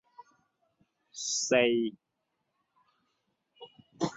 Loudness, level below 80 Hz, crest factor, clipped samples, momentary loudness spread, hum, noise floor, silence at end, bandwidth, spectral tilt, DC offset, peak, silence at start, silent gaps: -29 LUFS; -76 dBFS; 24 dB; under 0.1%; 12 LU; none; -82 dBFS; 0 s; 8.4 kHz; -3 dB/octave; under 0.1%; -10 dBFS; 0.2 s; none